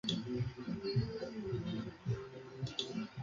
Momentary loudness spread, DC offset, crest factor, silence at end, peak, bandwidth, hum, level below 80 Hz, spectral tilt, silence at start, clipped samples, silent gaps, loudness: 5 LU; under 0.1%; 18 dB; 0 s; -22 dBFS; 7.6 kHz; none; -60 dBFS; -6.5 dB/octave; 0.05 s; under 0.1%; none; -41 LUFS